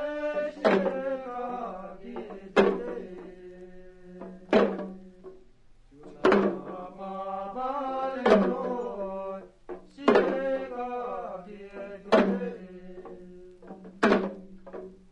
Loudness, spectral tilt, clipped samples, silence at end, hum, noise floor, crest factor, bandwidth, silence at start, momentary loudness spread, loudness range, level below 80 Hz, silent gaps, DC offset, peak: -28 LUFS; -6.5 dB/octave; under 0.1%; 0.15 s; none; -54 dBFS; 24 dB; 10.5 kHz; 0 s; 23 LU; 4 LU; -58 dBFS; none; under 0.1%; -6 dBFS